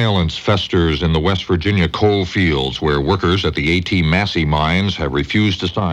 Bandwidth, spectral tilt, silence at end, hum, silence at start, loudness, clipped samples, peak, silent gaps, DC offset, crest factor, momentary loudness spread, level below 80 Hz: 9 kHz; -6.5 dB/octave; 0 s; none; 0 s; -16 LUFS; under 0.1%; -2 dBFS; none; under 0.1%; 14 dB; 2 LU; -30 dBFS